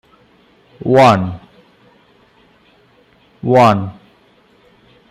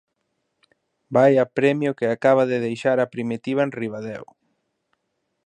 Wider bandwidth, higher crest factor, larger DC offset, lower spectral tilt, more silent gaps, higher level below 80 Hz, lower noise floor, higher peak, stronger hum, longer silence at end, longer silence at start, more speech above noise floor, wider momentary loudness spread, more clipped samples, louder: first, 15.5 kHz vs 9.8 kHz; about the same, 18 dB vs 18 dB; neither; about the same, -7 dB/octave vs -7 dB/octave; neither; first, -54 dBFS vs -70 dBFS; second, -51 dBFS vs -75 dBFS; first, 0 dBFS vs -4 dBFS; neither; about the same, 1.2 s vs 1.2 s; second, 0.85 s vs 1.1 s; second, 40 dB vs 55 dB; first, 18 LU vs 13 LU; neither; first, -13 LUFS vs -21 LUFS